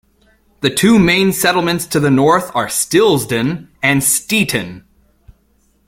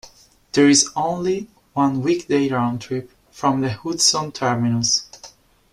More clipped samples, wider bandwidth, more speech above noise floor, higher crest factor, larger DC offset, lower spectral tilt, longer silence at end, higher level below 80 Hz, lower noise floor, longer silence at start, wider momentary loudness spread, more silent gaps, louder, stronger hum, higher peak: neither; first, 16.5 kHz vs 13 kHz; first, 43 dB vs 29 dB; about the same, 16 dB vs 18 dB; neither; about the same, -4 dB/octave vs -3.5 dB/octave; first, 1.1 s vs 0.45 s; first, -46 dBFS vs -56 dBFS; first, -57 dBFS vs -48 dBFS; first, 0.6 s vs 0.05 s; second, 7 LU vs 13 LU; neither; first, -14 LUFS vs -19 LUFS; neither; about the same, 0 dBFS vs -2 dBFS